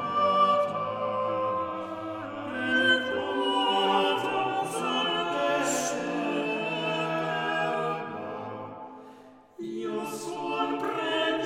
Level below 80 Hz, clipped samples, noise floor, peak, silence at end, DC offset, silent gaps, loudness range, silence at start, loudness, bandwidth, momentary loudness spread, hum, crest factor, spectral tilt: -74 dBFS; under 0.1%; -51 dBFS; -12 dBFS; 0 s; under 0.1%; none; 7 LU; 0 s; -28 LUFS; 16.5 kHz; 12 LU; none; 18 dB; -3.5 dB/octave